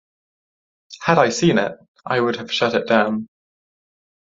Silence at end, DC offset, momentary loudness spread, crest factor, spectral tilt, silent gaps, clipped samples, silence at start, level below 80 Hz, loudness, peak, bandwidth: 0.95 s; under 0.1%; 12 LU; 20 dB; -5 dB/octave; 1.88-1.95 s; under 0.1%; 0.9 s; -62 dBFS; -19 LUFS; 0 dBFS; 7.8 kHz